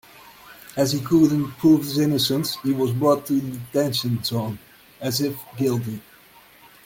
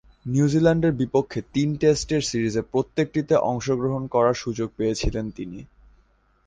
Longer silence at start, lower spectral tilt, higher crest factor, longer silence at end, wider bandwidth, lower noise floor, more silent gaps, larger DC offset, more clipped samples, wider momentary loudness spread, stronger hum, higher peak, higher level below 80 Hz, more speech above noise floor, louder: about the same, 0.25 s vs 0.25 s; about the same, -5.5 dB/octave vs -6 dB/octave; about the same, 16 dB vs 18 dB; about the same, 0.85 s vs 0.8 s; first, 17 kHz vs 9.8 kHz; second, -50 dBFS vs -61 dBFS; neither; neither; neither; first, 14 LU vs 9 LU; neither; about the same, -6 dBFS vs -6 dBFS; second, -58 dBFS vs -42 dBFS; second, 29 dB vs 39 dB; about the same, -22 LUFS vs -23 LUFS